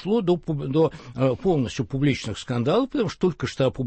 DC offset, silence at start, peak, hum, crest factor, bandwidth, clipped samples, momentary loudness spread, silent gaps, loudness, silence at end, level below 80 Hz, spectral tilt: under 0.1%; 0 s; -10 dBFS; none; 14 dB; 8.6 kHz; under 0.1%; 4 LU; none; -24 LUFS; 0 s; -48 dBFS; -7 dB/octave